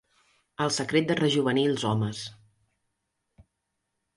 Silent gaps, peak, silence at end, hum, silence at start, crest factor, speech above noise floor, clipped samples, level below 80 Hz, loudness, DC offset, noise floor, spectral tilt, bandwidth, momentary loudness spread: none; -10 dBFS; 1.85 s; none; 0.6 s; 20 dB; 55 dB; under 0.1%; -64 dBFS; -26 LUFS; under 0.1%; -81 dBFS; -5 dB/octave; 11.5 kHz; 14 LU